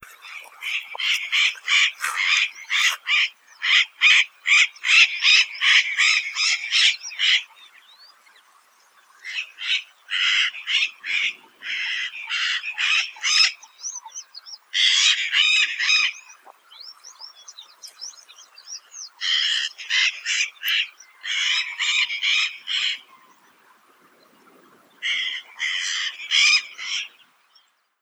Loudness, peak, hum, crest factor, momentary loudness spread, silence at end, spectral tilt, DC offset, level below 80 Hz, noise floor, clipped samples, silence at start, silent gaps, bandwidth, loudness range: -19 LUFS; -2 dBFS; none; 22 dB; 21 LU; 0.95 s; 6 dB/octave; under 0.1%; -86 dBFS; -61 dBFS; under 0.1%; 0.25 s; none; over 20 kHz; 10 LU